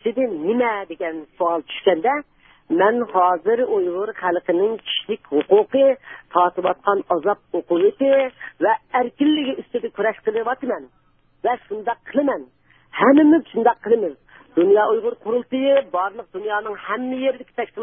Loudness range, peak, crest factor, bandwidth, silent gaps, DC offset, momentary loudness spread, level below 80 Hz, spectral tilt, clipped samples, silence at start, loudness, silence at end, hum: 5 LU; -2 dBFS; 18 dB; 3.7 kHz; none; under 0.1%; 10 LU; -66 dBFS; -9.5 dB/octave; under 0.1%; 0.05 s; -20 LUFS; 0 s; none